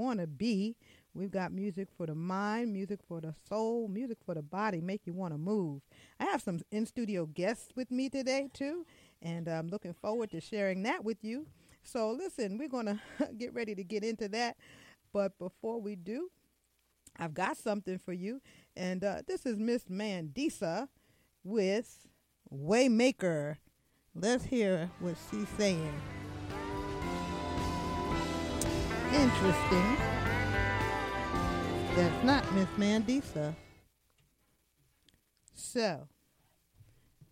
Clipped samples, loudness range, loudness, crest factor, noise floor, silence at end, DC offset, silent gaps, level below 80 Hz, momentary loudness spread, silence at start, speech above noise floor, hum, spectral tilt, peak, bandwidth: under 0.1%; 8 LU; -35 LUFS; 20 dB; -76 dBFS; 0.05 s; under 0.1%; none; -52 dBFS; 13 LU; 0 s; 42 dB; none; -5.5 dB/octave; -14 dBFS; 16.5 kHz